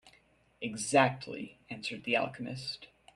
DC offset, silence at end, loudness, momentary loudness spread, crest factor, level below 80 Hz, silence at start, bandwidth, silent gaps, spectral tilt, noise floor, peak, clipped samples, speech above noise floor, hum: under 0.1%; 0.3 s; -33 LUFS; 17 LU; 26 dB; -72 dBFS; 0.05 s; 12.5 kHz; none; -4 dB/octave; -66 dBFS; -10 dBFS; under 0.1%; 33 dB; none